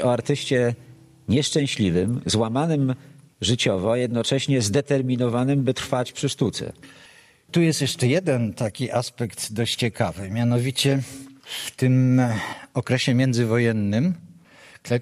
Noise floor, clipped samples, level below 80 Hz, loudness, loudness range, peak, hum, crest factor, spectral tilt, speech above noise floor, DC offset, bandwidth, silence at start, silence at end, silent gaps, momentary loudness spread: -49 dBFS; under 0.1%; -56 dBFS; -23 LUFS; 2 LU; -6 dBFS; none; 16 dB; -5.5 dB/octave; 27 dB; under 0.1%; 14.5 kHz; 0 s; 0 s; none; 9 LU